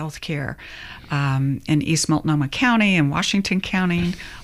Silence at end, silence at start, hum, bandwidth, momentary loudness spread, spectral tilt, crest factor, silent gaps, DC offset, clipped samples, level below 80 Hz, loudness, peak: 0 s; 0 s; none; 15 kHz; 11 LU; -5 dB/octave; 16 dB; none; under 0.1%; under 0.1%; -44 dBFS; -20 LUFS; -6 dBFS